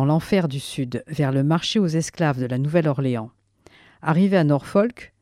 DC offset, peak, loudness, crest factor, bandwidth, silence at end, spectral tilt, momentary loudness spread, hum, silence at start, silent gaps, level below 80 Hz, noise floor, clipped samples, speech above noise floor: under 0.1%; -6 dBFS; -22 LUFS; 16 dB; 13.5 kHz; 0.15 s; -6.5 dB/octave; 9 LU; none; 0 s; none; -56 dBFS; -53 dBFS; under 0.1%; 33 dB